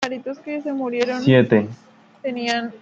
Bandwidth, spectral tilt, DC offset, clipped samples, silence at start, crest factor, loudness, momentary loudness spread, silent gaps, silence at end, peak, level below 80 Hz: 8 kHz; -6.5 dB/octave; under 0.1%; under 0.1%; 0 s; 20 dB; -20 LUFS; 15 LU; none; 0.05 s; 0 dBFS; -62 dBFS